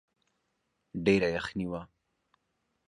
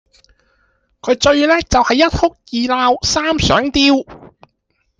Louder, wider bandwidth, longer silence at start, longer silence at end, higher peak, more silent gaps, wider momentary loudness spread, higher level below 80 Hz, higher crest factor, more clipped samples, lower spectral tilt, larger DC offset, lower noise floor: second, -30 LUFS vs -14 LUFS; first, 11 kHz vs 9.8 kHz; about the same, 0.95 s vs 1.05 s; first, 1 s vs 0.75 s; second, -12 dBFS vs 0 dBFS; neither; first, 15 LU vs 7 LU; second, -58 dBFS vs -36 dBFS; first, 22 dB vs 14 dB; neither; first, -6.5 dB/octave vs -4 dB/octave; neither; first, -79 dBFS vs -66 dBFS